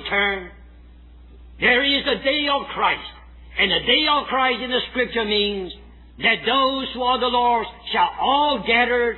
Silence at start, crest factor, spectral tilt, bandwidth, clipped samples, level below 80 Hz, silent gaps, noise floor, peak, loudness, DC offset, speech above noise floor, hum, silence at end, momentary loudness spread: 0 s; 16 dB; -6 dB/octave; 4.3 kHz; under 0.1%; -46 dBFS; none; -45 dBFS; -4 dBFS; -19 LUFS; under 0.1%; 24 dB; none; 0 s; 7 LU